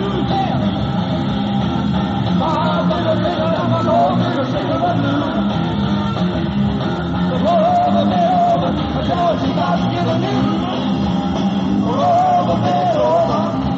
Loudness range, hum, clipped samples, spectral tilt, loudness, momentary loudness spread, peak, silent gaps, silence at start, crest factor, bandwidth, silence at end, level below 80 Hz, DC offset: 2 LU; none; under 0.1%; -6 dB/octave; -17 LUFS; 4 LU; -6 dBFS; none; 0 s; 12 dB; 7.8 kHz; 0 s; -36 dBFS; under 0.1%